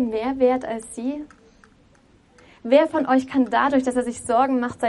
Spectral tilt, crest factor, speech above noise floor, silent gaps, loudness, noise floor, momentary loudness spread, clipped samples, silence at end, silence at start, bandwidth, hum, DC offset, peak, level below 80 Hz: -4.5 dB/octave; 20 dB; 35 dB; none; -21 LUFS; -55 dBFS; 12 LU; under 0.1%; 0 s; 0 s; 11.5 kHz; none; under 0.1%; -2 dBFS; -56 dBFS